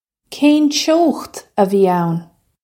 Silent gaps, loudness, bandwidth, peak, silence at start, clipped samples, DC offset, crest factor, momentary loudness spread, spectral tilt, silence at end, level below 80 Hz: none; -15 LUFS; 16.5 kHz; -2 dBFS; 0.3 s; under 0.1%; under 0.1%; 14 dB; 12 LU; -5 dB/octave; 0.4 s; -62 dBFS